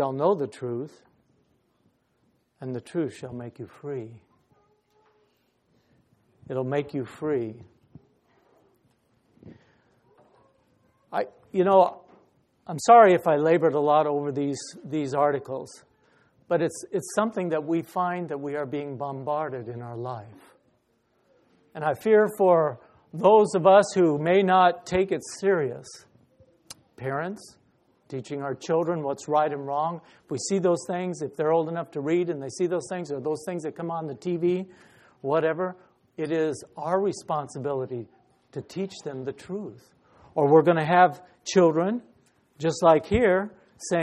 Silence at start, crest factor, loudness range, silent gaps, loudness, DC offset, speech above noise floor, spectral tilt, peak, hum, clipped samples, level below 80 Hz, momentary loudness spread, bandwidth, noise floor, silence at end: 0 s; 22 dB; 16 LU; none; -25 LUFS; under 0.1%; 45 dB; -6 dB/octave; -4 dBFS; none; under 0.1%; -58 dBFS; 18 LU; 14 kHz; -69 dBFS; 0 s